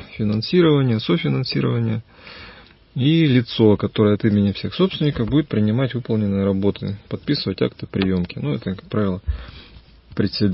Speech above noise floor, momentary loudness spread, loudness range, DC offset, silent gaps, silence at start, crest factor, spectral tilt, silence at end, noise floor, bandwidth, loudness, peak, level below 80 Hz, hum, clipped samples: 25 dB; 13 LU; 5 LU; under 0.1%; none; 0 s; 18 dB; -11.5 dB/octave; 0 s; -44 dBFS; 5.8 kHz; -20 LUFS; -2 dBFS; -40 dBFS; none; under 0.1%